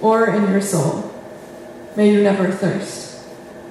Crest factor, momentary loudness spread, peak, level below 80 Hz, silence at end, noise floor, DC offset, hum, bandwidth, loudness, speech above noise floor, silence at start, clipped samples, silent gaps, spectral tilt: 16 dB; 21 LU; -2 dBFS; -60 dBFS; 0 s; -36 dBFS; under 0.1%; none; 13.5 kHz; -18 LUFS; 20 dB; 0 s; under 0.1%; none; -6 dB/octave